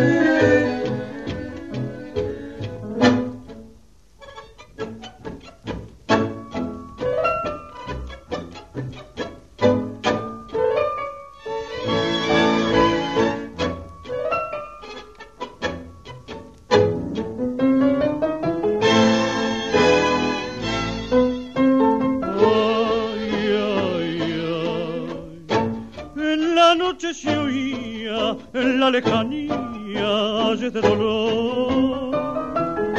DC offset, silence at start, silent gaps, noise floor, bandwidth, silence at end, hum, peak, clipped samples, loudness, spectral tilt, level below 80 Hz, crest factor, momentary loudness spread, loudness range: 0.2%; 0 s; none; -51 dBFS; 8.2 kHz; 0 s; none; -2 dBFS; under 0.1%; -21 LUFS; -5.5 dB/octave; -46 dBFS; 20 dB; 17 LU; 7 LU